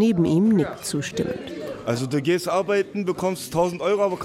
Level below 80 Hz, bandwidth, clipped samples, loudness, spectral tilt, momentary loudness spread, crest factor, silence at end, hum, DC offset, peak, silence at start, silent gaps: -54 dBFS; 16 kHz; under 0.1%; -23 LUFS; -6 dB/octave; 9 LU; 14 dB; 0 s; none; under 0.1%; -8 dBFS; 0 s; none